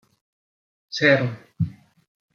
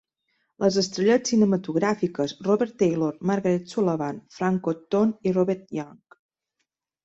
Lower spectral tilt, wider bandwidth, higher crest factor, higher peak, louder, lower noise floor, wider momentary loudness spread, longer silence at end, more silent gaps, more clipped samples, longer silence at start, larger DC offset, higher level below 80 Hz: about the same, -6 dB/octave vs -6 dB/octave; second, 7.2 kHz vs 8 kHz; first, 24 dB vs 16 dB; first, -2 dBFS vs -8 dBFS; about the same, -22 LUFS vs -24 LUFS; first, under -90 dBFS vs -80 dBFS; first, 12 LU vs 8 LU; second, 0.6 s vs 1.1 s; neither; neither; first, 0.9 s vs 0.6 s; neither; about the same, -60 dBFS vs -64 dBFS